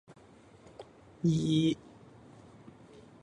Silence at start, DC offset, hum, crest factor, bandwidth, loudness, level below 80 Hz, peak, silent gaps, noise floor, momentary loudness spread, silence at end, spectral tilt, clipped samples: 0.1 s; under 0.1%; none; 18 dB; 10.5 kHz; -30 LUFS; -64 dBFS; -16 dBFS; none; -57 dBFS; 27 LU; 1.45 s; -7 dB/octave; under 0.1%